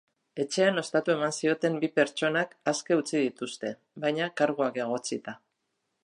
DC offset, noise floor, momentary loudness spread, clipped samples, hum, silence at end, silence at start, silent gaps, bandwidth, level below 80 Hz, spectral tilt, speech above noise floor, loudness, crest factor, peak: under 0.1%; -80 dBFS; 11 LU; under 0.1%; none; 0.65 s; 0.35 s; none; 11.5 kHz; -80 dBFS; -4 dB/octave; 51 dB; -28 LUFS; 18 dB; -10 dBFS